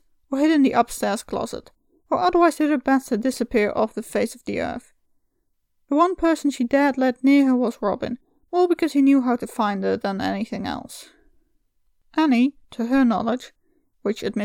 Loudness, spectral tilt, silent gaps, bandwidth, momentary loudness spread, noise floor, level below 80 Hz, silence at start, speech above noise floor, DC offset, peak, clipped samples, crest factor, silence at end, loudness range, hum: -21 LUFS; -5.5 dB/octave; none; 16.5 kHz; 12 LU; -70 dBFS; -54 dBFS; 0.3 s; 50 dB; under 0.1%; -4 dBFS; under 0.1%; 18 dB; 0 s; 4 LU; none